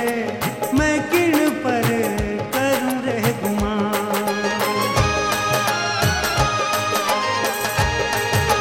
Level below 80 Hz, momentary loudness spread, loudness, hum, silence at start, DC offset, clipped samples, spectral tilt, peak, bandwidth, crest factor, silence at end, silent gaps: -36 dBFS; 4 LU; -20 LUFS; none; 0 s; under 0.1%; under 0.1%; -4 dB/octave; -4 dBFS; 17 kHz; 14 dB; 0 s; none